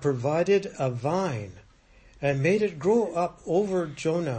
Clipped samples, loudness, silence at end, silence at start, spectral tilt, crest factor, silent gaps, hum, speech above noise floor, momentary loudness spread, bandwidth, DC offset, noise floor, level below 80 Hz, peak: under 0.1%; -26 LUFS; 0 s; 0 s; -7 dB/octave; 16 dB; none; none; 30 dB; 7 LU; 8.8 kHz; under 0.1%; -55 dBFS; -58 dBFS; -12 dBFS